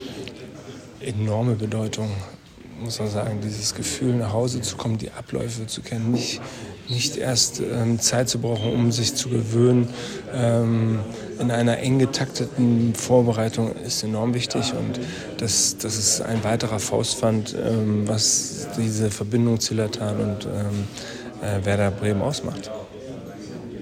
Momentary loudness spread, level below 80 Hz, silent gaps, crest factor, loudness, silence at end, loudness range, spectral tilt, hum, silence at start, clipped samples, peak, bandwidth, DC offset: 14 LU; -54 dBFS; none; 18 dB; -23 LUFS; 0 s; 5 LU; -4.5 dB/octave; none; 0 s; under 0.1%; -6 dBFS; 15.5 kHz; under 0.1%